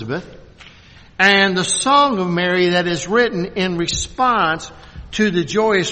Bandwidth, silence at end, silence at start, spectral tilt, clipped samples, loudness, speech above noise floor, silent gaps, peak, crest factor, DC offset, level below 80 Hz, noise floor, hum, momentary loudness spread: 8.8 kHz; 0 s; 0 s; -3.5 dB/octave; under 0.1%; -16 LUFS; 27 dB; none; 0 dBFS; 18 dB; under 0.1%; -42 dBFS; -44 dBFS; none; 13 LU